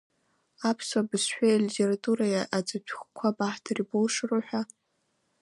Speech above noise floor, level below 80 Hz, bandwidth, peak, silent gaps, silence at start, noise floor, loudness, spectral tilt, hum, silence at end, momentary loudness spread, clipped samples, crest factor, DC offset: 47 dB; -80 dBFS; 11.5 kHz; -12 dBFS; none; 0.6 s; -75 dBFS; -28 LUFS; -4.5 dB/octave; none; 0.75 s; 10 LU; under 0.1%; 16 dB; under 0.1%